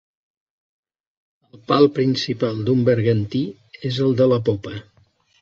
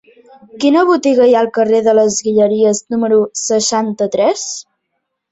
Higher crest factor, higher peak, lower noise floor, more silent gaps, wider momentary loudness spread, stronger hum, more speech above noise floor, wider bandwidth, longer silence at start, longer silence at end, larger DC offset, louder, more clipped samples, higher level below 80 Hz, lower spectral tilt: first, 20 dB vs 12 dB; about the same, -2 dBFS vs -2 dBFS; second, -59 dBFS vs -72 dBFS; neither; first, 13 LU vs 6 LU; neither; second, 40 dB vs 59 dB; second, 7.6 kHz vs 8.4 kHz; first, 1.7 s vs 0.55 s; about the same, 0.6 s vs 0.7 s; neither; second, -19 LUFS vs -13 LUFS; neither; about the same, -54 dBFS vs -58 dBFS; first, -7.5 dB/octave vs -4 dB/octave